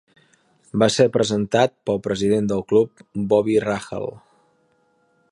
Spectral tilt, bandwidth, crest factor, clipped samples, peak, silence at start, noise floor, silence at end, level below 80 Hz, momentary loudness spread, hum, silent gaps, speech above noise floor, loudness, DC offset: -5.5 dB/octave; 11.5 kHz; 20 dB; under 0.1%; -2 dBFS; 0.75 s; -63 dBFS; 1.15 s; -54 dBFS; 11 LU; none; none; 44 dB; -20 LUFS; under 0.1%